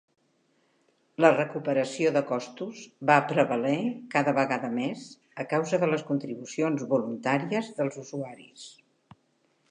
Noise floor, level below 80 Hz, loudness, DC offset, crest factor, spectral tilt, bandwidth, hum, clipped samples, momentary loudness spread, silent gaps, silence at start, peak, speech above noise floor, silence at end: -70 dBFS; -82 dBFS; -27 LUFS; under 0.1%; 22 dB; -6 dB/octave; 10 kHz; none; under 0.1%; 17 LU; none; 1.2 s; -6 dBFS; 43 dB; 1 s